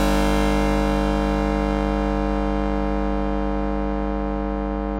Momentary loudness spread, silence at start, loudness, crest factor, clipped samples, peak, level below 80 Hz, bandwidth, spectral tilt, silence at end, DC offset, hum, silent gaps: 5 LU; 0 s; -23 LUFS; 16 dB; under 0.1%; -6 dBFS; -26 dBFS; 15 kHz; -6.5 dB/octave; 0 s; under 0.1%; 50 Hz at -25 dBFS; none